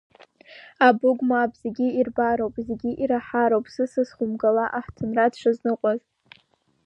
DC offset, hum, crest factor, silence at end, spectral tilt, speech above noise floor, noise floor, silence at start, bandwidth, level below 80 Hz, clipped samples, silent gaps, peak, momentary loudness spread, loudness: under 0.1%; none; 22 dB; 0.9 s; -7 dB/octave; 40 dB; -63 dBFS; 0.5 s; 8.6 kHz; -58 dBFS; under 0.1%; none; -2 dBFS; 8 LU; -23 LUFS